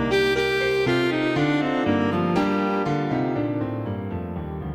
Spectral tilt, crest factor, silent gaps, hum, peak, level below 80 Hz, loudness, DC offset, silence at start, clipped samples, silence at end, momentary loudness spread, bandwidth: -6.5 dB/octave; 14 dB; none; none; -10 dBFS; -46 dBFS; -23 LUFS; under 0.1%; 0 s; under 0.1%; 0 s; 9 LU; 14 kHz